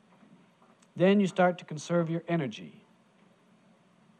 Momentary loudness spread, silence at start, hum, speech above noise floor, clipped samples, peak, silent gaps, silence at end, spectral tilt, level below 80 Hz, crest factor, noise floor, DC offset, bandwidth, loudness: 21 LU; 0.95 s; none; 35 dB; under 0.1%; -12 dBFS; none; 1.5 s; -6.5 dB/octave; -84 dBFS; 18 dB; -63 dBFS; under 0.1%; 9.4 kHz; -28 LUFS